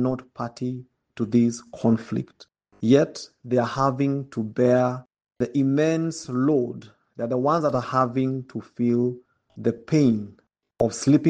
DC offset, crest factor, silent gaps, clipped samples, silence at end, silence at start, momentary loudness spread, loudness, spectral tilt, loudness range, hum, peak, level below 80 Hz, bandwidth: under 0.1%; 20 dB; none; under 0.1%; 0 s; 0 s; 12 LU; -24 LUFS; -7 dB/octave; 2 LU; none; -4 dBFS; -62 dBFS; 9.6 kHz